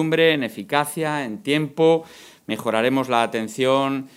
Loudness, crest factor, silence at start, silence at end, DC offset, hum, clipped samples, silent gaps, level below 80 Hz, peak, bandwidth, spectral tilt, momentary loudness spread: -21 LUFS; 18 dB; 0 s; 0.1 s; under 0.1%; none; under 0.1%; none; -70 dBFS; -2 dBFS; 16 kHz; -5 dB/octave; 7 LU